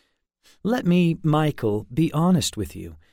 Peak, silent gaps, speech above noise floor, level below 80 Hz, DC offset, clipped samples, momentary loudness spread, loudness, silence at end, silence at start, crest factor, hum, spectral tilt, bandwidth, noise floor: -10 dBFS; none; 40 dB; -48 dBFS; under 0.1%; under 0.1%; 12 LU; -22 LUFS; 0.15 s; 0.65 s; 14 dB; none; -6.5 dB/octave; 16 kHz; -62 dBFS